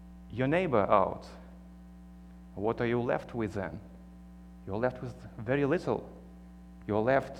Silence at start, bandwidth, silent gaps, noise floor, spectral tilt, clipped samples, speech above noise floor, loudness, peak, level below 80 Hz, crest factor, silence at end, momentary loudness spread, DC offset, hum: 0 s; 11.5 kHz; none; -50 dBFS; -8 dB/octave; under 0.1%; 20 dB; -31 LUFS; -8 dBFS; -54 dBFS; 24 dB; 0 s; 24 LU; under 0.1%; 60 Hz at -50 dBFS